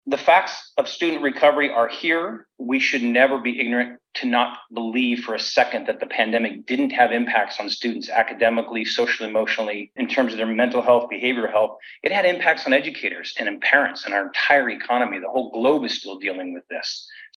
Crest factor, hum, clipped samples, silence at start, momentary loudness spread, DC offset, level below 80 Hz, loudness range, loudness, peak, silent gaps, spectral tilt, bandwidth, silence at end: 20 dB; none; under 0.1%; 0.05 s; 10 LU; under 0.1%; -80 dBFS; 2 LU; -21 LUFS; -2 dBFS; none; -3.5 dB/octave; 11.5 kHz; 0.1 s